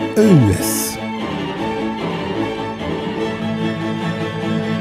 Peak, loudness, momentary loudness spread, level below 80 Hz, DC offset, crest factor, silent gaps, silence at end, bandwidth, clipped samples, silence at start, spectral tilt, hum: -2 dBFS; -19 LUFS; 11 LU; -46 dBFS; under 0.1%; 18 dB; none; 0 s; 16 kHz; under 0.1%; 0 s; -5.5 dB/octave; none